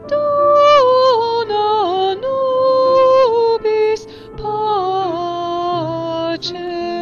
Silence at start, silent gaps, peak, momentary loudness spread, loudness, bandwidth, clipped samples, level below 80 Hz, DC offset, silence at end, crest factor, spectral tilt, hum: 0 s; none; -4 dBFS; 12 LU; -15 LUFS; 7 kHz; under 0.1%; -48 dBFS; under 0.1%; 0 s; 12 dB; -5 dB/octave; none